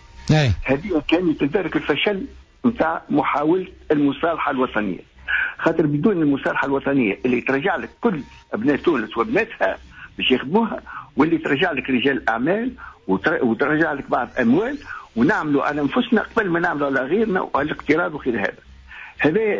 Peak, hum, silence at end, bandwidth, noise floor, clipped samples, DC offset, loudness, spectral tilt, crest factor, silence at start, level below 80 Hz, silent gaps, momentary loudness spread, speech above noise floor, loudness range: -6 dBFS; none; 0 s; 7.6 kHz; -40 dBFS; under 0.1%; under 0.1%; -20 LUFS; -7 dB/octave; 14 dB; 0.15 s; -44 dBFS; none; 7 LU; 20 dB; 1 LU